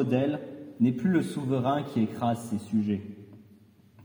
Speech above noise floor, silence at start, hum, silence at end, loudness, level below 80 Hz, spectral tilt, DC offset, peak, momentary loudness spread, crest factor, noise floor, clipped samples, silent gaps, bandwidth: 30 dB; 0 s; none; 0 s; -28 LUFS; -74 dBFS; -7.5 dB/octave; under 0.1%; -12 dBFS; 10 LU; 16 dB; -57 dBFS; under 0.1%; none; over 20 kHz